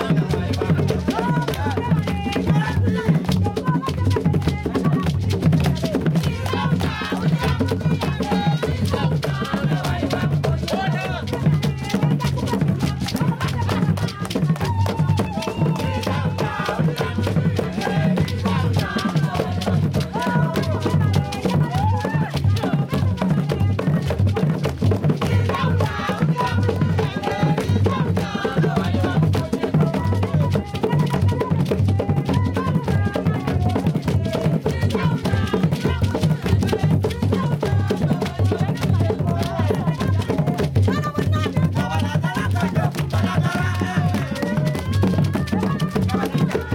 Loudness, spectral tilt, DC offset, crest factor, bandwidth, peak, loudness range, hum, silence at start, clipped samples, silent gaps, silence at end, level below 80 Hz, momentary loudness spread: -21 LUFS; -7 dB/octave; under 0.1%; 12 dB; 16.5 kHz; -8 dBFS; 1 LU; none; 0 s; under 0.1%; none; 0 s; -40 dBFS; 3 LU